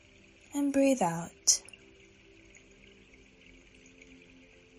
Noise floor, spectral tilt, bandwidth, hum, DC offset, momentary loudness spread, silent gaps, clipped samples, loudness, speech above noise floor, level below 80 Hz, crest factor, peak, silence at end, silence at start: -59 dBFS; -3 dB/octave; 15 kHz; none; under 0.1%; 11 LU; none; under 0.1%; -28 LUFS; 30 dB; -66 dBFS; 26 dB; -8 dBFS; 3.2 s; 0.55 s